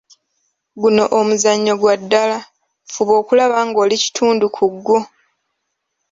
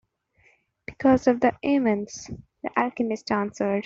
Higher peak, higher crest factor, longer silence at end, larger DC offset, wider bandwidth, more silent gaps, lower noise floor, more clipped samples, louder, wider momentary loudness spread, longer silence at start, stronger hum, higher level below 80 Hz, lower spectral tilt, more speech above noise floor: first, 0 dBFS vs -6 dBFS; about the same, 16 dB vs 18 dB; first, 1.05 s vs 0 s; neither; about the same, 7.8 kHz vs 7.6 kHz; neither; first, -73 dBFS vs -63 dBFS; neither; first, -15 LUFS vs -24 LUFS; second, 6 LU vs 18 LU; second, 0.75 s vs 0.9 s; neither; second, -62 dBFS vs -56 dBFS; second, -3.5 dB/octave vs -6 dB/octave; first, 59 dB vs 40 dB